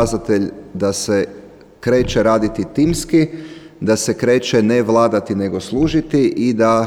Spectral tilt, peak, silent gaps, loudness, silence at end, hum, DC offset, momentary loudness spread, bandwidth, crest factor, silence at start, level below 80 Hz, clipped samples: -5.5 dB/octave; -2 dBFS; none; -17 LUFS; 0 s; none; 0.1%; 8 LU; 15.5 kHz; 14 dB; 0 s; -38 dBFS; under 0.1%